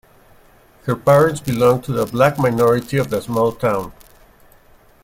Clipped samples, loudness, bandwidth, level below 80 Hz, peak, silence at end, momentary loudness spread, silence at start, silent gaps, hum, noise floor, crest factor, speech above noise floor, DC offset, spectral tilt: under 0.1%; -17 LUFS; 16.5 kHz; -48 dBFS; -2 dBFS; 1.1 s; 10 LU; 0.85 s; none; none; -49 dBFS; 16 dB; 33 dB; under 0.1%; -6.5 dB/octave